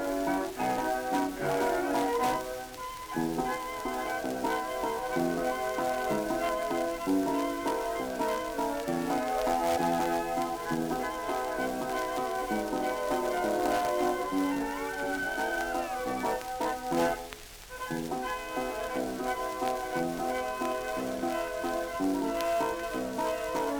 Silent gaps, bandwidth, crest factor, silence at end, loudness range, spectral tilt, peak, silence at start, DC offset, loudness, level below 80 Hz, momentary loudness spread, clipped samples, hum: none; over 20 kHz; 18 dB; 0 s; 3 LU; -4 dB/octave; -12 dBFS; 0 s; under 0.1%; -31 LUFS; -54 dBFS; 5 LU; under 0.1%; none